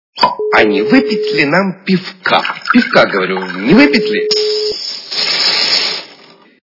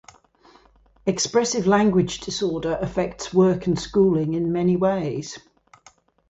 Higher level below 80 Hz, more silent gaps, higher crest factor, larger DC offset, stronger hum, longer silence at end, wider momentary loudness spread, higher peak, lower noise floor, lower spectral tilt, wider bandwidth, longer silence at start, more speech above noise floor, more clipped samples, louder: about the same, -48 dBFS vs -50 dBFS; neither; about the same, 12 dB vs 16 dB; neither; neither; second, 0.55 s vs 0.9 s; about the same, 8 LU vs 9 LU; first, 0 dBFS vs -6 dBFS; second, -41 dBFS vs -55 dBFS; about the same, -4.5 dB/octave vs -5.5 dB/octave; second, 6 kHz vs 8.2 kHz; second, 0.15 s vs 1.05 s; second, 30 dB vs 34 dB; first, 0.4% vs under 0.1%; first, -12 LUFS vs -22 LUFS